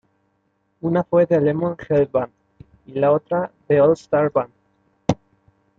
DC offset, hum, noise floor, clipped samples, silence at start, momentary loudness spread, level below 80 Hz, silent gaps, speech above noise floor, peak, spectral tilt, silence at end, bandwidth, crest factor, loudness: under 0.1%; none; -68 dBFS; under 0.1%; 0.85 s; 12 LU; -54 dBFS; none; 49 dB; -2 dBFS; -8.5 dB/octave; 0.65 s; 7.6 kHz; 18 dB; -20 LUFS